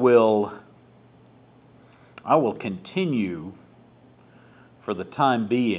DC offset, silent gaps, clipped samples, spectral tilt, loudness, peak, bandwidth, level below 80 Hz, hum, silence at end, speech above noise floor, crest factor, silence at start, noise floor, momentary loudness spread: under 0.1%; none; under 0.1%; -10.5 dB/octave; -24 LUFS; -4 dBFS; 4 kHz; -64 dBFS; none; 0 s; 31 dB; 20 dB; 0 s; -53 dBFS; 18 LU